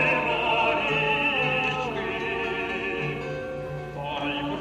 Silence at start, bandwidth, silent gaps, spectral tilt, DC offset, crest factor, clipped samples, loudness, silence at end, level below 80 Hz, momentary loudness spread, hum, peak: 0 s; 14.5 kHz; none; -5.5 dB/octave; under 0.1%; 16 dB; under 0.1%; -26 LUFS; 0 s; -50 dBFS; 11 LU; none; -12 dBFS